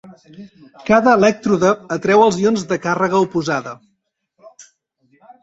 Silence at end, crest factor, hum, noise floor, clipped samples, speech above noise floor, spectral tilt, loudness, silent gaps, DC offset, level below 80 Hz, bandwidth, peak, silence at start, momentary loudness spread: 0.8 s; 16 dB; none; -70 dBFS; under 0.1%; 54 dB; -5.5 dB/octave; -16 LUFS; none; under 0.1%; -56 dBFS; 8 kHz; -2 dBFS; 0.05 s; 9 LU